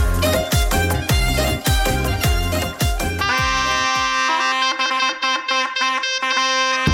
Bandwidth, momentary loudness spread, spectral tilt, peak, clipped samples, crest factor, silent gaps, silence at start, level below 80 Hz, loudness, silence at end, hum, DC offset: 17 kHz; 3 LU; -3.5 dB/octave; -4 dBFS; under 0.1%; 14 dB; none; 0 s; -26 dBFS; -18 LUFS; 0 s; none; under 0.1%